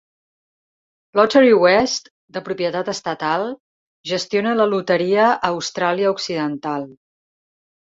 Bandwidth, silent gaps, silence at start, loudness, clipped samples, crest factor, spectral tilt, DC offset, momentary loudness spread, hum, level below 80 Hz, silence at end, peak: 7.8 kHz; 2.11-2.28 s, 3.60-4.04 s; 1.15 s; -18 LUFS; under 0.1%; 18 dB; -4.5 dB/octave; under 0.1%; 15 LU; none; -60 dBFS; 1 s; -2 dBFS